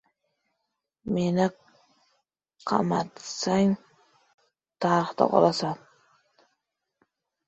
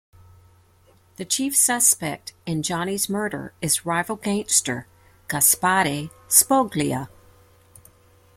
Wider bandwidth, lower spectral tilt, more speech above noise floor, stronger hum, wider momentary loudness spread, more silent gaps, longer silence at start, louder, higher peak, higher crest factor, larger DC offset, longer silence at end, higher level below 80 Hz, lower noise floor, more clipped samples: second, 8.2 kHz vs 16.5 kHz; first, -6 dB/octave vs -2.5 dB/octave; first, 57 dB vs 34 dB; neither; second, 12 LU vs 15 LU; first, 4.34-4.38 s vs none; second, 1.05 s vs 1.2 s; second, -26 LUFS vs -20 LUFS; second, -4 dBFS vs 0 dBFS; about the same, 24 dB vs 24 dB; neither; first, 1.7 s vs 1.3 s; second, -64 dBFS vs -58 dBFS; first, -81 dBFS vs -56 dBFS; neither